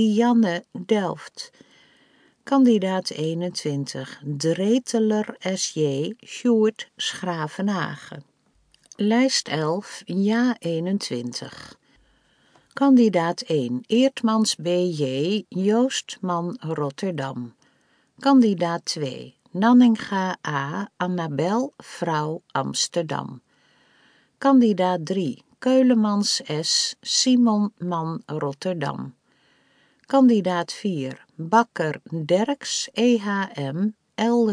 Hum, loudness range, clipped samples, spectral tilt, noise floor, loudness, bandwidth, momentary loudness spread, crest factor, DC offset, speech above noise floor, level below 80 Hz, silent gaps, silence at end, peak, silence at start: none; 5 LU; under 0.1%; -5 dB/octave; -63 dBFS; -22 LUFS; 10.5 kHz; 13 LU; 20 dB; under 0.1%; 42 dB; -74 dBFS; none; 0 s; -2 dBFS; 0 s